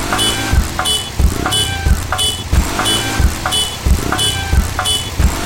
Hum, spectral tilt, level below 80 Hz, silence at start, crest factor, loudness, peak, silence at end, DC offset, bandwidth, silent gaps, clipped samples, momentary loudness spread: none; -3 dB/octave; -20 dBFS; 0 s; 14 dB; -15 LUFS; -2 dBFS; 0 s; 0.3%; 17 kHz; none; under 0.1%; 3 LU